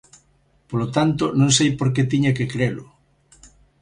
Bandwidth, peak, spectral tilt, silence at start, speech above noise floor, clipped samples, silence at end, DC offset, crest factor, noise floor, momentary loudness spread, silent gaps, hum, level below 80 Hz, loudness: 11 kHz; -6 dBFS; -5 dB/octave; 0.7 s; 41 dB; under 0.1%; 0.35 s; under 0.1%; 16 dB; -60 dBFS; 10 LU; none; none; -50 dBFS; -20 LUFS